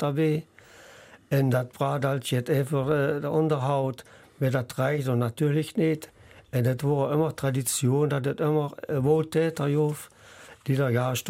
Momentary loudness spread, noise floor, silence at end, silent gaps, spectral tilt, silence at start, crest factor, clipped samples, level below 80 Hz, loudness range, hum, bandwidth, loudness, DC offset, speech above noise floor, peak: 6 LU; -51 dBFS; 0 s; none; -6.5 dB/octave; 0 s; 16 dB; under 0.1%; -62 dBFS; 2 LU; none; 16 kHz; -26 LUFS; under 0.1%; 25 dB; -10 dBFS